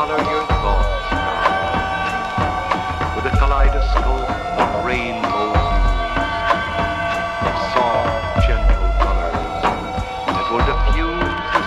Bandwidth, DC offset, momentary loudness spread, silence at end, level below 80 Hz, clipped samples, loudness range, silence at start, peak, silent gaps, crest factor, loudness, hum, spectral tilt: 9 kHz; under 0.1%; 4 LU; 0 s; -22 dBFS; under 0.1%; 1 LU; 0 s; -2 dBFS; none; 16 dB; -19 LUFS; none; -6 dB/octave